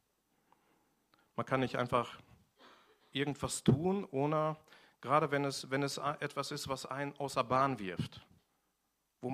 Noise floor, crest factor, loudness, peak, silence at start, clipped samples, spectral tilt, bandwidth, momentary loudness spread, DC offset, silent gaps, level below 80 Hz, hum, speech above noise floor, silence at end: -82 dBFS; 22 dB; -35 LUFS; -14 dBFS; 1.4 s; under 0.1%; -5.5 dB/octave; 15.5 kHz; 13 LU; under 0.1%; none; -66 dBFS; none; 47 dB; 0 s